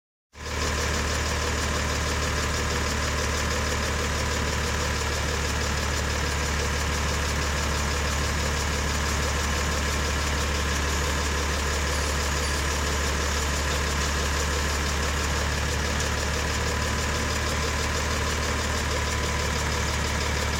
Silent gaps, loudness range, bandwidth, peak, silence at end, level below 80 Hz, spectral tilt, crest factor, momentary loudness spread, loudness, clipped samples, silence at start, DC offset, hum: none; 1 LU; 16 kHz; -12 dBFS; 0 s; -30 dBFS; -3.5 dB/octave; 14 dB; 1 LU; -26 LUFS; under 0.1%; 0.35 s; under 0.1%; none